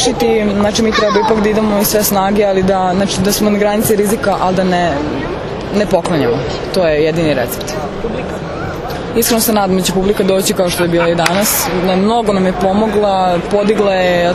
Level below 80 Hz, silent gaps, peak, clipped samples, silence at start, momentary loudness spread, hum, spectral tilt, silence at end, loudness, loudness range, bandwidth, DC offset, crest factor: -34 dBFS; none; 0 dBFS; under 0.1%; 0 s; 8 LU; none; -4.5 dB/octave; 0 s; -13 LUFS; 3 LU; 14.5 kHz; under 0.1%; 12 dB